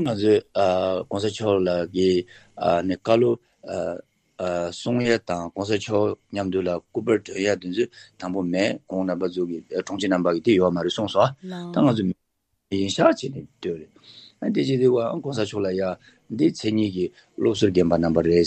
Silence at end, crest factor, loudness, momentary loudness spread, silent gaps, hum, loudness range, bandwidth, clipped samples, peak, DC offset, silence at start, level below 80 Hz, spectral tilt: 0 s; 22 dB; -23 LUFS; 11 LU; none; none; 3 LU; 8.8 kHz; under 0.1%; -2 dBFS; under 0.1%; 0 s; -60 dBFS; -6 dB/octave